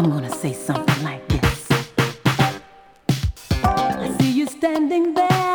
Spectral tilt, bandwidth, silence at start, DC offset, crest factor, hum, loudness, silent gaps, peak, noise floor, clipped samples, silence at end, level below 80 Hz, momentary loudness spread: -5.5 dB/octave; over 20 kHz; 0 s; under 0.1%; 16 dB; none; -21 LUFS; none; -4 dBFS; -47 dBFS; under 0.1%; 0 s; -36 dBFS; 5 LU